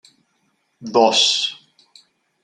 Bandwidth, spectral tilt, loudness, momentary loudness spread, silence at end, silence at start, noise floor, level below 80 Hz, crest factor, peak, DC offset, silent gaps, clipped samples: 11 kHz; -1.5 dB/octave; -16 LUFS; 13 LU; 0.9 s; 0.8 s; -67 dBFS; -68 dBFS; 20 dB; -2 dBFS; under 0.1%; none; under 0.1%